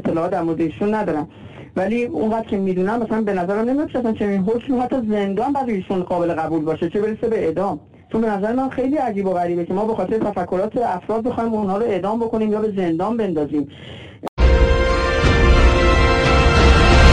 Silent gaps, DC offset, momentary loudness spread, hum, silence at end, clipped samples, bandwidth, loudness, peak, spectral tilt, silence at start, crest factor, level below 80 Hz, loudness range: 14.29-14.37 s; under 0.1%; 9 LU; none; 0 s; under 0.1%; 9.8 kHz; -19 LUFS; 0 dBFS; -6.5 dB/octave; 0 s; 18 dB; -24 dBFS; 5 LU